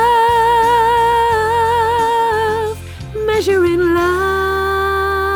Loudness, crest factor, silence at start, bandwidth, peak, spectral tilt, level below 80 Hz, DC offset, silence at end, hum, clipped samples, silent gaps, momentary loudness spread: -14 LUFS; 10 dB; 0 s; over 20 kHz; -4 dBFS; -5 dB/octave; -34 dBFS; under 0.1%; 0 s; none; under 0.1%; none; 6 LU